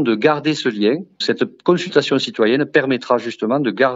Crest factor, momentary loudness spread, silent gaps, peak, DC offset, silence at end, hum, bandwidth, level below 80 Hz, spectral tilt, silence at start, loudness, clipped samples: 16 dB; 4 LU; none; 0 dBFS; under 0.1%; 0 s; none; 8 kHz; -68 dBFS; -5.5 dB/octave; 0 s; -18 LUFS; under 0.1%